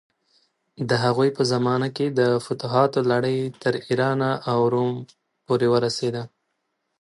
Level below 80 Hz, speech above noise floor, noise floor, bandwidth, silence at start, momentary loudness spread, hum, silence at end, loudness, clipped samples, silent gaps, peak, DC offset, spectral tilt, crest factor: -64 dBFS; 54 dB; -75 dBFS; 11.5 kHz; 0.8 s; 7 LU; none; 0.75 s; -22 LUFS; under 0.1%; none; -4 dBFS; under 0.1%; -6 dB/octave; 18 dB